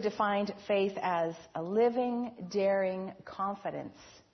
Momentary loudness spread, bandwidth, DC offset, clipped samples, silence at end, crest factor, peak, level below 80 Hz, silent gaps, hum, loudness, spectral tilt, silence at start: 11 LU; 6.4 kHz; under 0.1%; under 0.1%; 0.15 s; 16 dB; -16 dBFS; -72 dBFS; none; none; -32 LUFS; -6 dB/octave; 0 s